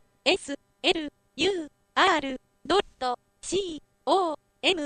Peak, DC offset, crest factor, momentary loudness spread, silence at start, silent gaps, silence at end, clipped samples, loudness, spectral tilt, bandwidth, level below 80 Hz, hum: -8 dBFS; under 0.1%; 20 dB; 13 LU; 0.25 s; none; 0 s; under 0.1%; -27 LUFS; -2 dB/octave; 10.5 kHz; -58 dBFS; none